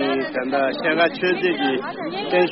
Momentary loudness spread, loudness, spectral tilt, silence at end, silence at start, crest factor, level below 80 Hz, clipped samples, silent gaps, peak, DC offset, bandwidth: 7 LU; -21 LUFS; -2.5 dB/octave; 0 s; 0 s; 16 dB; -62 dBFS; under 0.1%; none; -6 dBFS; under 0.1%; 5.8 kHz